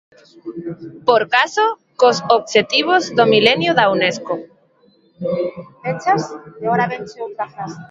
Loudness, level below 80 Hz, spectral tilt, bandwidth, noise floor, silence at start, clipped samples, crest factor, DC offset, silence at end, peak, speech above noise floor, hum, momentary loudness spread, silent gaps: -17 LUFS; -62 dBFS; -4 dB/octave; 7.8 kHz; -55 dBFS; 0.45 s; under 0.1%; 18 dB; under 0.1%; 0.05 s; 0 dBFS; 38 dB; none; 16 LU; none